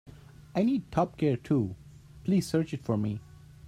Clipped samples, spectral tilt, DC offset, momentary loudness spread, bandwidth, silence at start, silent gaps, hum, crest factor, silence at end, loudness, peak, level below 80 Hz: under 0.1%; -7.5 dB/octave; under 0.1%; 10 LU; 15 kHz; 0.05 s; none; none; 18 dB; 0 s; -30 LUFS; -12 dBFS; -56 dBFS